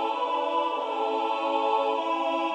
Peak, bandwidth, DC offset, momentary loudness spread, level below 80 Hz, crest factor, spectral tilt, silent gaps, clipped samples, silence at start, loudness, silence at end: -14 dBFS; 9.4 kHz; under 0.1%; 3 LU; -88 dBFS; 14 dB; -2 dB/octave; none; under 0.1%; 0 s; -27 LUFS; 0 s